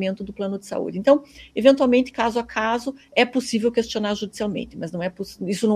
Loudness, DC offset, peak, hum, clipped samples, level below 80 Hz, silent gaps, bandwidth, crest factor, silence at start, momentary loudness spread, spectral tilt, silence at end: -22 LUFS; under 0.1%; -2 dBFS; none; under 0.1%; -54 dBFS; none; 14.5 kHz; 20 dB; 0 s; 11 LU; -5 dB/octave; 0 s